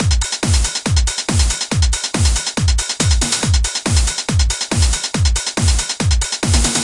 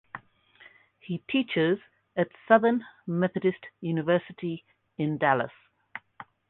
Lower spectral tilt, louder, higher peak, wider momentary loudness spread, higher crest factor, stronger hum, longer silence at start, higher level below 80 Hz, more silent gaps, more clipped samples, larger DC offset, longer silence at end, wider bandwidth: second, -3 dB/octave vs -10 dB/octave; first, -16 LUFS vs -28 LUFS; first, -2 dBFS vs -6 dBFS; second, 2 LU vs 22 LU; second, 14 dB vs 24 dB; neither; second, 0 s vs 0.15 s; first, -20 dBFS vs -72 dBFS; neither; neither; neither; second, 0 s vs 0.25 s; first, 11.5 kHz vs 4.2 kHz